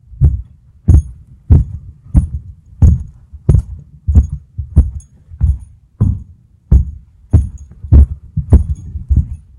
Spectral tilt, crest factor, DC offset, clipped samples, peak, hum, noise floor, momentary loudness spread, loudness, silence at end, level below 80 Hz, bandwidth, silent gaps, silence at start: -10.5 dB/octave; 14 dB; under 0.1%; 1%; 0 dBFS; none; -39 dBFS; 15 LU; -15 LUFS; 0.25 s; -16 dBFS; 7 kHz; none; 0.1 s